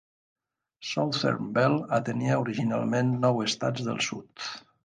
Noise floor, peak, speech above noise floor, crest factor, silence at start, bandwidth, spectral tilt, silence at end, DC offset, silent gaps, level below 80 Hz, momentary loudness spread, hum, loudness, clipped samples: -51 dBFS; -10 dBFS; 24 dB; 18 dB; 0.8 s; 9.8 kHz; -5.5 dB/octave; 0.25 s; under 0.1%; none; -68 dBFS; 12 LU; none; -28 LUFS; under 0.1%